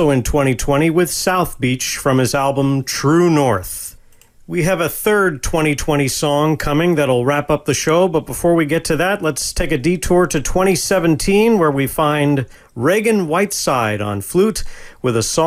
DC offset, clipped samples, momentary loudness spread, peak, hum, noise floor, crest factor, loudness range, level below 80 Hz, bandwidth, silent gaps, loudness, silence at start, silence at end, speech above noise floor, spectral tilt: under 0.1%; under 0.1%; 5 LU; -2 dBFS; none; -45 dBFS; 14 dB; 2 LU; -34 dBFS; 16 kHz; none; -16 LUFS; 0 s; 0 s; 30 dB; -5 dB/octave